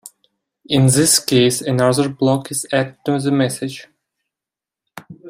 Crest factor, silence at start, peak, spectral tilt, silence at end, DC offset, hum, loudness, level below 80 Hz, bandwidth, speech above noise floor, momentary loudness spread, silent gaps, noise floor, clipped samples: 18 dB; 0.05 s; 0 dBFS; -4.5 dB/octave; 0 s; under 0.1%; none; -16 LUFS; -54 dBFS; 16 kHz; 71 dB; 8 LU; none; -87 dBFS; under 0.1%